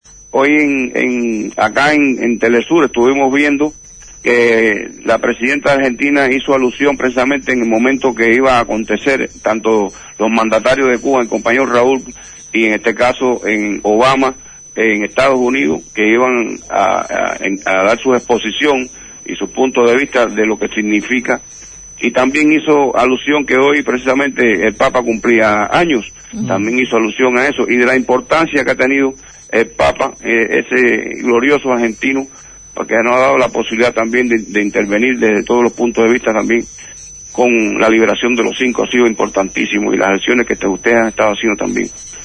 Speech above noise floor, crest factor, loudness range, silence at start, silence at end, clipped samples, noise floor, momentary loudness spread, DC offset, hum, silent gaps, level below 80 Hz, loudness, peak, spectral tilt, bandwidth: 20 dB; 12 dB; 2 LU; 0.35 s; 0 s; under 0.1%; -33 dBFS; 7 LU; under 0.1%; none; none; -44 dBFS; -13 LUFS; 0 dBFS; -4 dB/octave; 10.5 kHz